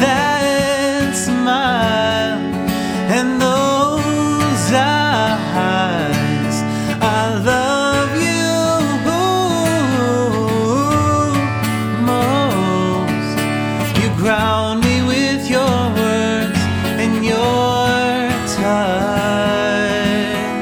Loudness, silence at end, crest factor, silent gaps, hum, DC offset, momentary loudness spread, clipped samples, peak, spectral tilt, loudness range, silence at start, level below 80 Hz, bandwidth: -16 LUFS; 0 s; 14 dB; none; none; under 0.1%; 3 LU; under 0.1%; -2 dBFS; -5 dB/octave; 1 LU; 0 s; -42 dBFS; over 20 kHz